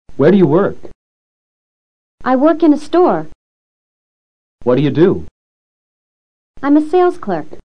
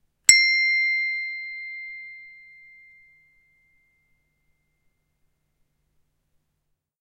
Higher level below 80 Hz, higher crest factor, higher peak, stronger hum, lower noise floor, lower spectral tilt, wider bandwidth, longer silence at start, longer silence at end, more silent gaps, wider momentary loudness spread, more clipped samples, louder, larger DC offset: first, -48 dBFS vs -68 dBFS; second, 16 dB vs 28 dB; about the same, 0 dBFS vs 0 dBFS; neither; first, under -90 dBFS vs -76 dBFS; first, -8.5 dB/octave vs 4 dB/octave; second, 9.6 kHz vs 16 kHz; second, 0.05 s vs 0.3 s; second, 0.05 s vs 4.7 s; first, 0.95-2.18 s, 3.35-4.59 s, 5.31-6.54 s vs none; second, 11 LU vs 23 LU; neither; first, -13 LUFS vs -19 LUFS; first, 4% vs under 0.1%